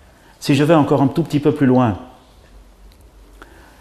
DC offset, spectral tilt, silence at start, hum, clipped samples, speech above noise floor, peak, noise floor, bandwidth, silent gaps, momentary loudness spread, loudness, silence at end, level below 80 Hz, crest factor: under 0.1%; -7.5 dB/octave; 0.4 s; none; under 0.1%; 30 dB; 0 dBFS; -45 dBFS; 14 kHz; none; 8 LU; -16 LUFS; 1.75 s; -48 dBFS; 18 dB